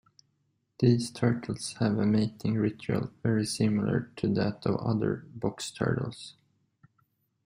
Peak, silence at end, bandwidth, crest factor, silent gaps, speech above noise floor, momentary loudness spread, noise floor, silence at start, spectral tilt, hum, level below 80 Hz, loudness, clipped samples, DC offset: -10 dBFS; 1.15 s; 15.5 kHz; 18 dB; none; 47 dB; 8 LU; -75 dBFS; 0.8 s; -6.5 dB/octave; none; -60 dBFS; -29 LUFS; under 0.1%; under 0.1%